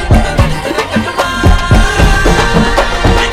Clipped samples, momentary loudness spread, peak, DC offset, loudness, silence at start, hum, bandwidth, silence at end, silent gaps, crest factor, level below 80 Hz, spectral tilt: 0.8%; 5 LU; 0 dBFS; under 0.1%; -11 LUFS; 0 s; none; 15 kHz; 0 s; none; 8 dB; -14 dBFS; -5 dB/octave